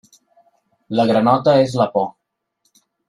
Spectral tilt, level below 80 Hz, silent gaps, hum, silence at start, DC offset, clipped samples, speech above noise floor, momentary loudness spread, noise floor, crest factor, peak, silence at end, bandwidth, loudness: -7 dB/octave; -58 dBFS; none; none; 0.9 s; under 0.1%; under 0.1%; 53 dB; 9 LU; -69 dBFS; 18 dB; -2 dBFS; 1 s; 12 kHz; -17 LUFS